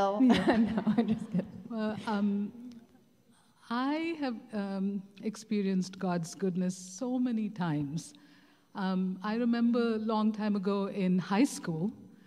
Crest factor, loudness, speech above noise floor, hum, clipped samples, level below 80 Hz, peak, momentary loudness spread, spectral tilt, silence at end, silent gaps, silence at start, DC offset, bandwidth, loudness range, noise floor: 18 dB; -32 LUFS; 34 dB; none; under 0.1%; -66 dBFS; -14 dBFS; 10 LU; -6.5 dB/octave; 0.2 s; none; 0 s; under 0.1%; 12.5 kHz; 5 LU; -65 dBFS